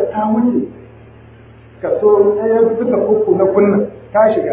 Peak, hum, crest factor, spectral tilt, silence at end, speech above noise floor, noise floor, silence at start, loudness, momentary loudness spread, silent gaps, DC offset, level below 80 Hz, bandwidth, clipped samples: 0 dBFS; none; 14 dB; -12 dB/octave; 0 s; 27 dB; -40 dBFS; 0 s; -14 LUFS; 8 LU; none; under 0.1%; -48 dBFS; 3.8 kHz; under 0.1%